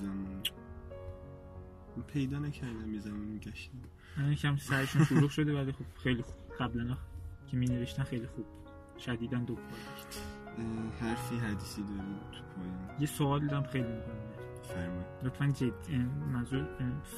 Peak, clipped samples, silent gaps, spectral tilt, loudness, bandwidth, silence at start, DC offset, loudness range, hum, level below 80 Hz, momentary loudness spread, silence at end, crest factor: -16 dBFS; under 0.1%; none; -6.5 dB/octave; -36 LUFS; 13.5 kHz; 0 s; under 0.1%; 8 LU; none; -54 dBFS; 16 LU; 0 s; 20 dB